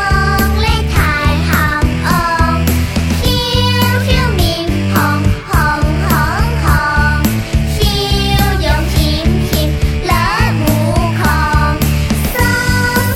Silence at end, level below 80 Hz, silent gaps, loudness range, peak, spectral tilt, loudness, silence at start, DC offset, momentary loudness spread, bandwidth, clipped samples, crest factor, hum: 0 s; -18 dBFS; none; 1 LU; 0 dBFS; -5 dB/octave; -13 LUFS; 0 s; under 0.1%; 2 LU; 18 kHz; under 0.1%; 12 dB; none